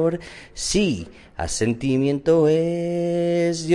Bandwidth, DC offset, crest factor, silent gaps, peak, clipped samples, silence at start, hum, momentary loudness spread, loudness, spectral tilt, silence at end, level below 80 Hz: 11.5 kHz; under 0.1%; 14 dB; none; -6 dBFS; under 0.1%; 0 s; none; 13 LU; -21 LUFS; -5.5 dB/octave; 0 s; -44 dBFS